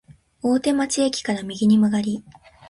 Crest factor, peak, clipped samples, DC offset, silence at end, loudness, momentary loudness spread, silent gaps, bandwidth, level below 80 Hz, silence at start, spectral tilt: 14 dB; -8 dBFS; under 0.1%; under 0.1%; 0.4 s; -21 LUFS; 10 LU; none; 11.5 kHz; -58 dBFS; 0.1 s; -5 dB/octave